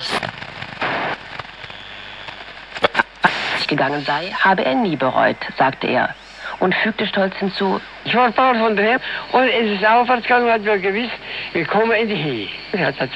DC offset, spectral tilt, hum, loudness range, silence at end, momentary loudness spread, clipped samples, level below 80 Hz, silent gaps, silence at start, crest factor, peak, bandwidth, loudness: under 0.1%; -5.5 dB/octave; none; 5 LU; 0 s; 16 LU; under 0.1%; -52 dBFS; none; 0 s; 18 dB; 0 dBFS; 10.5 kHz; -18 LUFS